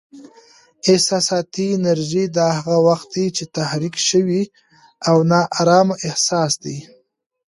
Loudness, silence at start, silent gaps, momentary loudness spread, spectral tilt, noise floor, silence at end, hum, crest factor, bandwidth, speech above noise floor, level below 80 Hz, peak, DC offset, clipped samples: -17 LUFS; 0.15 s; none; 8 LU; -4.5 dB/octave; -61 dBFS; 0.65 s; none; 16 dB; 11.5 kHz; 44 dB; -62 dBFS; -2 dBFS; under 0.1%; under 0.1%